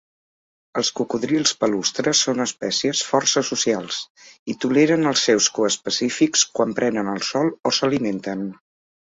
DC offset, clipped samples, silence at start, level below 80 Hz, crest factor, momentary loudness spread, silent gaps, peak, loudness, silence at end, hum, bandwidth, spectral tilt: under 0.1%; under 0.1%; 0.75 s; -64 dBFS; 18 dB; 11 LU; 4.10-4.15 s, 4.39-4.46 s; -4 dBFS; -20 LUFS; 0.65 s; none; 8 kHz; -3 dB/octave